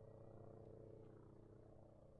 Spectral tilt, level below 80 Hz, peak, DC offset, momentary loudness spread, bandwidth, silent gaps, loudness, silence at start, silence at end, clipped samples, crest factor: -10 dB/octave; -74 dBFS; -48 dBFS; under 0.1%; 5 LU; 4.5 kHz; none; -63 LUFS; 0 s; 0 s; under 0.1%; 12 dB